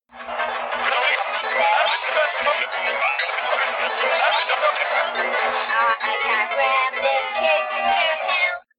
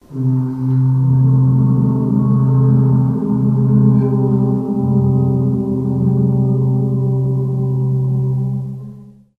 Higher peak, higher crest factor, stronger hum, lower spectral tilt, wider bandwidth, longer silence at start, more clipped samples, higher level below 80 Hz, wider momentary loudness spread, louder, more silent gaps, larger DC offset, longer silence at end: second, -6 dBFS vs -2 dBFS; about the same, 16 dB vs 12 dB; first, 60 Hz at -55 dBFS vs none; second, -4.5 dB/octave vs -13 dB/octave; first, 5.2 kHz vs 1.6 kHz; about the same, 0.15 s vs 0.1 s; neither; second, -66 dBFS vs -44 dBFS; second, 3 LU vs 6 LU; second, -20 LUFS vs -15 LUFS; neither; neither; second, 0.2 s vs 0.35 s